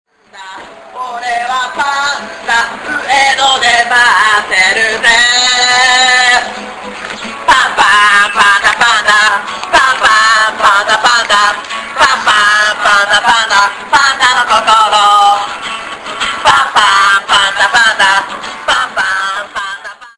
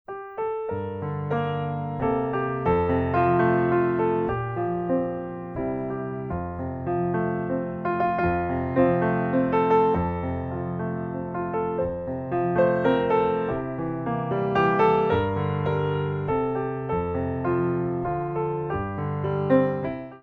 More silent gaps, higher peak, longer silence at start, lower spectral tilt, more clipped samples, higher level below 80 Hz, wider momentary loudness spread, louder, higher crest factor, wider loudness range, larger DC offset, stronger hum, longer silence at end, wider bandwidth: neither; first, 0 dBFS vs -8 dBFS; first, 0.35 s vs 0.1 s; second, 0.5 dB/octave vs -10 dB/octave; neither; about the same, -44 dBFS vs -46 dBFS; first, 13 LU vs 9 LU; first, -8 LUFS vs -25 LUFS; second, 10 dB vs 18 dB; about the same, 3 LU vs 4 LU; neither; neither; about the same, 0.1 s vs 0.05 s; first, 11 kHz vs 5.4 kHz